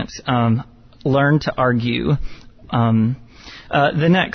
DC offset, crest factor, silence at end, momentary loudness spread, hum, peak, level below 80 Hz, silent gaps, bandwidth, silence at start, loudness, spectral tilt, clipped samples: under 0.1%; 14 dB; 0 s; 12 LU; none; -4 dBFS; -40 dBFS; none; 6.4 kHz; 0 s; -18 LUFS; -7.5 dB/octave; under 0.1%